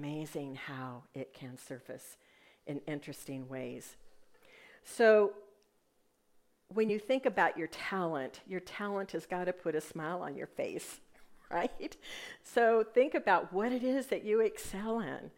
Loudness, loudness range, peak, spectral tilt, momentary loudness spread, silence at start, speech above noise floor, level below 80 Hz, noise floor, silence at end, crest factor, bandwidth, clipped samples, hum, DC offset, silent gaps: -34 LUFS; 13 LU; -14 dBFS; -5 dB/octave; 18 LU; 0 s; 39 dB; -66 dBFS; -73 dBFS; 0.1 s; 22 dB; 16 kHz; under 0.1%; none; under 0.1%; none